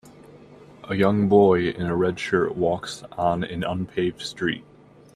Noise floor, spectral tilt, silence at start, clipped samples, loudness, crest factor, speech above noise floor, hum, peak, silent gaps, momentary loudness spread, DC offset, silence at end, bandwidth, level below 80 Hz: -47 dBFS; -6.5 dB/octave; 0.05 s; under 0.1%; -23 LUFS; 20 dB; 25 dB; none; -4 dBFS; none; 11 LU; under 0.1%; 0.55 s; 12.5 kHz; -54 dBFS